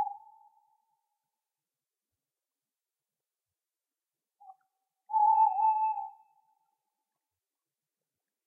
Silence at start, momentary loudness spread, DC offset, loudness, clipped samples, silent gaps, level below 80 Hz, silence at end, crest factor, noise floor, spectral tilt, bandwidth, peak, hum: 0 s; 19 LU; under 0.1%; -28 LUFS; under 0.1%; none; under -90 dBFS; 2.35 s; 20 dB; under -90 dBFS; -2 dB/octave; 2.8 kHz; -16 dBFS; none